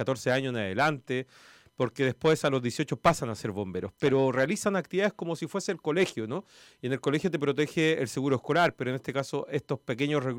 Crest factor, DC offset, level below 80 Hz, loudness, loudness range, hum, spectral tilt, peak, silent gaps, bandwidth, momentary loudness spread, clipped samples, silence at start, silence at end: 18 dB; under 0.1%; -62 dBFS; -29 LUFS; 2 LU; none; -5.5 dB/octave; -10 dBFS; none; 16.5 kHz; 9 LU; under 0.1%; 0 s; 0 s